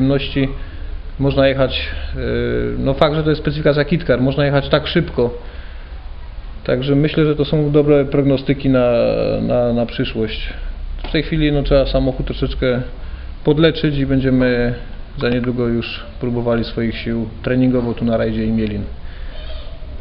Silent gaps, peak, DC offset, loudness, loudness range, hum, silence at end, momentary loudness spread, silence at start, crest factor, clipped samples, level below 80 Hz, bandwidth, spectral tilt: none; 0 dBFS; under 0.1%; -17 LUFS; 4 LU; none; 0 s; 18 LU; 0 s; 16 dB; under 0.1%; -28 dBFS; 5.6 kHz; -10.5 dB/octave